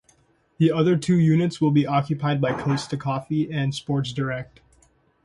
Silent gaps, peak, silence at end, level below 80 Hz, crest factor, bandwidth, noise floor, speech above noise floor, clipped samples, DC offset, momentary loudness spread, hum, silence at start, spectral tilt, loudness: none; -8 dBFS; 0.8 s; -58 dBFS; 16 dB; 11.5 kHz; -61 dBFS; 39 dB; under 0.1%; under 0.1%; 8 LU; none; 0.6 s; -7 dB/octave; -23 LUFS